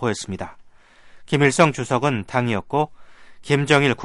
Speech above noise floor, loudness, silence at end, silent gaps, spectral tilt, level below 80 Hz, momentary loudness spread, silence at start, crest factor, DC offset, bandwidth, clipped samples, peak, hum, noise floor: 28 dB; -20 LUFS; 0 s; none; -5 dB/octave; -54 dBFS; 13 LU; 0 s; 18 dB; under 0.1%; 11.5 kHz; under 0.1%; -2 dBFS; none; -48 dBFS